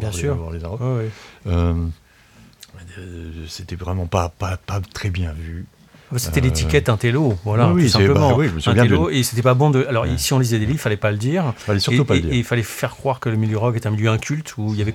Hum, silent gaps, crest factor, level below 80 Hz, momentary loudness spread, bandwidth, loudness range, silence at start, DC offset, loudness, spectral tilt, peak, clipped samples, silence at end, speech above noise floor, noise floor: none; none; 18 dB; -34 dBFS; 15 LU; 16.5 kHz; 10 LU; 0 s; under 0.1%; -19 LUFS; -6 dB/octave; -2 dBFS; under 0.1%; 0 s; 30 dB; -49 dBFS